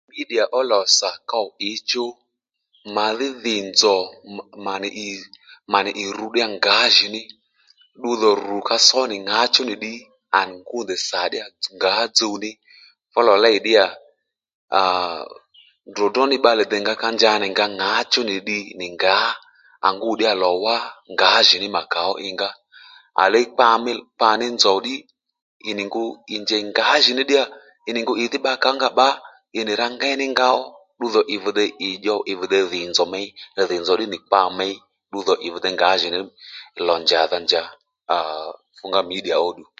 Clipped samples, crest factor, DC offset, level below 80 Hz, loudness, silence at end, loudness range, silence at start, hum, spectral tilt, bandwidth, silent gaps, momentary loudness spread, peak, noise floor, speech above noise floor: under 0.1%; 20 dB; under 0.1%; -68 dBFS; -19 LUFS; 0.15 s; 4 LU; 0.15 s; none; -1.5 dB/octave; 9.4 kHz; 14.54-14.68 s, 25.42-25.60 s; 14 LU; 0 dBFS; -77 dBFS; 58 dB